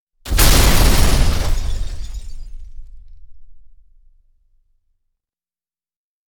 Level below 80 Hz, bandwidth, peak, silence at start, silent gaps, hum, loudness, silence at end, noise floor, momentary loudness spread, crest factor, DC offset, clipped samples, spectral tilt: -20 dBFS; over 20 kHz; 0 dBFS; 0.25 s; none; none; -16 LUFS; 2.7 s; under -90 dBFS; 25 LU; 16 dB; under 0.1%; under 0.1%; -3.5 dB/octave